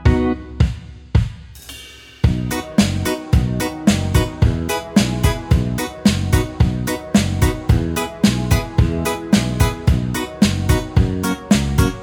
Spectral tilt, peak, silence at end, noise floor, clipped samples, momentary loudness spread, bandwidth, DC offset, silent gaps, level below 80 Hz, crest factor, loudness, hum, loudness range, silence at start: -6 dB/octave; -2 dBFS; 0 s; -38 dBFS; under 0.1%; 6 LU; over 20 kHz; under 0.1%; none; -24 dBFS; 16 dB; -18 LUFS; none; 2 LU; 0 s